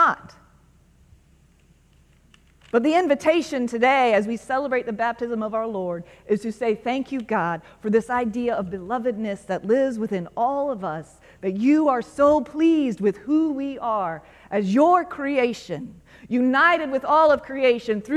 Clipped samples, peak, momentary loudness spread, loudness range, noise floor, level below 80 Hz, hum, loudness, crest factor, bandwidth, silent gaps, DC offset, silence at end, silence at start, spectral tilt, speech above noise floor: under 0.1%; -6 dBFS; 11 LU; 4 LU; -57 dBFS; -58 dBFS; none; -22 LUFS; 18 dB; 12 kHz; none; under 0.1%; 0 s; 0 s; -6 dB/octave; 35 dB